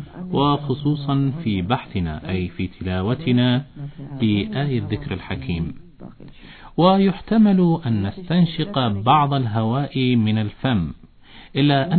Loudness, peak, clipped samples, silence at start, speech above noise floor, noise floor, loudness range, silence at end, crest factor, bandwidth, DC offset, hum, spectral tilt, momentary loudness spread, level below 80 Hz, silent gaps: -21 LUFS; -4 dBFS; under 0.1%; 0 s; 25 dB; -44 dBFS; 5 LU; 0 s; 18 dB; 4.5 kHz; under 0.1%; none; -10.5 dB/octave; 11 LU; -44 dBFS; none